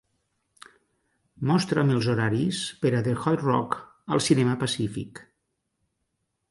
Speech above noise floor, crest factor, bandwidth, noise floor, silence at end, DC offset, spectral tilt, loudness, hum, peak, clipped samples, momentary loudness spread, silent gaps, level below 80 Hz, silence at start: 54 dB; 20 dB; 11.5 kHz; -78 dBFS; 1.3 s; under 0.1%; -6 dB/octave; -25 LUFS; none; -8 dBFS; under 0.1%; 9 LU; none; -60 dBFS; 1.4 s